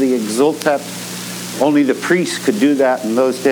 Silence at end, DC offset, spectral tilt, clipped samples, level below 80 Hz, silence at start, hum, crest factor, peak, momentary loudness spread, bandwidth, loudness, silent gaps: 0 s; under 0.1%; -4.5 dB/octave; under 0.1%; -66 dBFS; 0 s; none; 14 dB; -2 dBFS; 11 LU; over 20 kHz; -16 LUFS; none